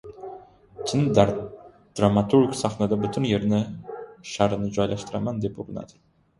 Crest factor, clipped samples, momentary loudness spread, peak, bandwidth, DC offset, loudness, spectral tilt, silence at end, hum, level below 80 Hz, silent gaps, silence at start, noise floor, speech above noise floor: 24 dB; under 0.1%; 18 LU; -2 dBFS; 11.5 kHz; under 0.1%; -24 LUFS; -6.5 dB/octave; 0.55 s; none; -50 dBFS; none; 0.05 s; -45 dBFS; 22 dB